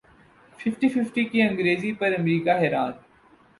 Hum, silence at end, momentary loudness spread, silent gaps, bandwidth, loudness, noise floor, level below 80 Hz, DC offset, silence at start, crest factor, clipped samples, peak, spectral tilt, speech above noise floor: none; 0.65 s; 7 LU; none; 11.5 kHz; -24 LUFS; -56 dBFS; -64 dBFS; under 0.1%; 0.6 s; 16 dB; under 0.1%; -8 dBFS; -7 dB/octave; 33 dB